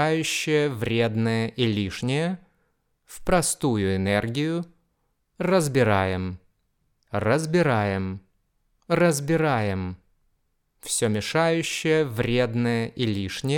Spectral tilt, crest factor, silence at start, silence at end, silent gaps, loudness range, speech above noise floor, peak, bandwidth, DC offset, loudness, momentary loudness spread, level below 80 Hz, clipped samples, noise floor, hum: -5 dB/octave; 18 dB; 0 s; 0 s; none; 2 LU; 49 dB; -6 dBFS; 18 kHz; under 0.1%; -24 LUFS; 10 LU; -50 dBFS; under 0.1%; -72 dBFS; none